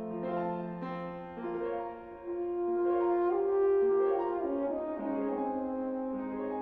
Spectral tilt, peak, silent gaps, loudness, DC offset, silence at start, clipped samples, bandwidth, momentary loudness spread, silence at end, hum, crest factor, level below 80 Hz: -10.5 dB/octave; -20 dBFS; none; -33 LUFS; under 0.1%; 0 s; under 0.1%; 4.3 kHz; 11 LU; 0 s; none; 12 dB; -64 dBFS